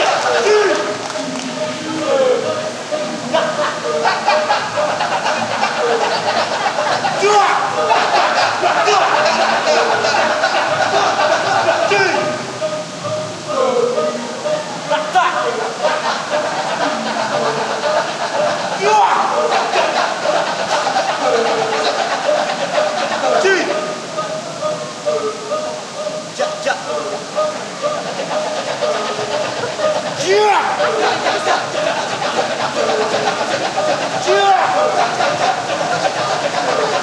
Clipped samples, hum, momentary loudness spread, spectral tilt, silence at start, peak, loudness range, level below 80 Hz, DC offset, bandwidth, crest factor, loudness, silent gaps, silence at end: under 0.1%; none; 9 LU; -2.5 dB/octave; 0 s; 0 dBFS; 6 LU; -62 dBFS; under 0.1%; 12 kHz; 16 dB; -16 LUFS; none; 0 s